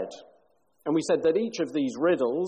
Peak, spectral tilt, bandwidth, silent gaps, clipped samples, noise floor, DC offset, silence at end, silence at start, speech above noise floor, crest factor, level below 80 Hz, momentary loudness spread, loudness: -14 dBFS; -5.5 dB/octave; 9.4 kHz; none; under 0.1%; -66 dBFS; under 0.1%; 0 s; 0 s; 41 dB; 14 dB; -70 dBFS; 8 LU; -26 LUFS